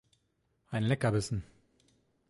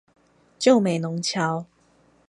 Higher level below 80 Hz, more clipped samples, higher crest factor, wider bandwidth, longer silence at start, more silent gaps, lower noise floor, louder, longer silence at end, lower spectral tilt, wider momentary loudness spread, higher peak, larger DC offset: first, -56 dBFS vs -70 dBFS; neither; about the same, 20 dB vs 20 dB; about the same, 11.5 kHz vs 11.5 kHz; about the same, 0.7 s vs 0.6 s; neither; first, -76 dBFS vs -60 dBFS; second, -33 LUFS vs -22 LUFS; first, 0.85 s vs 0.65 s; about the same, -6 dB/octave vs -5 dB/octave; about the same, 10 LU vs 8 LU; second, -16 dBFS vs -4 dBFS; neither